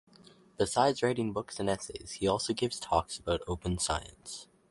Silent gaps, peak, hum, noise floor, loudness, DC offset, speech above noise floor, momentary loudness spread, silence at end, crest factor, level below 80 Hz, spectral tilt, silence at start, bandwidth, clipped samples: none; -10 dBFS; none; -59 dBFS; -32 LUFS; under 0.1%; 27 dB; 13 LU; 0.25 s; 22 dB; -50 dBFS; -4 dB/octave; 0.6 s; 11.5 kHz; under 0.1%